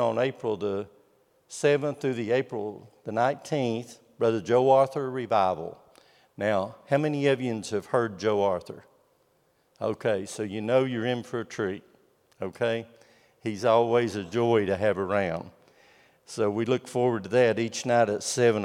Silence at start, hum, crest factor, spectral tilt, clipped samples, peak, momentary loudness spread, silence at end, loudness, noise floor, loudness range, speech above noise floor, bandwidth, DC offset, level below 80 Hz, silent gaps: 0 s; none; 18 dB; -5.5 dB/octave; under 0.1%; -8 dBFS; 13 LU; 0 s; -27 LUFS; -67 dBFS; 4 LU; 41 dB; 14 kHz; under 0.1%; -74 dBFS; none